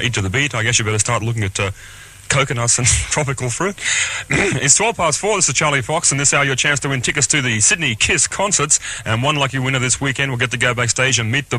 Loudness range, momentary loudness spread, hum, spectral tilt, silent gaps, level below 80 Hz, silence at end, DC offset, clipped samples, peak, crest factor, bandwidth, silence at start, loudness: 3 LU; 6 LU; none; -2.5 dB/octave; none; -40 dBFS; 0 s; under 0.1%; under 0.1%; 0 dBFS; 18 dB; 14 kHz; 0 s; -16 LUFS